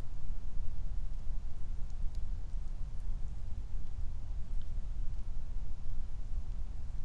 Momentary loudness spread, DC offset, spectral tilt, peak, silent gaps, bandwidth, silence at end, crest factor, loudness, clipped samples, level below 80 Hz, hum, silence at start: 2 LU; under 0.1%; -7 dB/octave; -20 dBFS; none; 1.7 kHz; 0 s; 10 dB; -45 LUFS; under 0.1%; -36 dBFS; none; 0 s